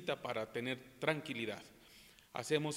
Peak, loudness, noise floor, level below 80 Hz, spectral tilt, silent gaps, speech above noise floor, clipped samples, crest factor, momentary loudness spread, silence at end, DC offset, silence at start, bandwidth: -16 dBFS; -40 LUFS; -62 dBFS; -76 dBFS; -4.5 dB/octave; none; 22 dB; under 0.1%; 24 dB; 21 LU; 0 s; under 0.1%; 0 s; 16 kHz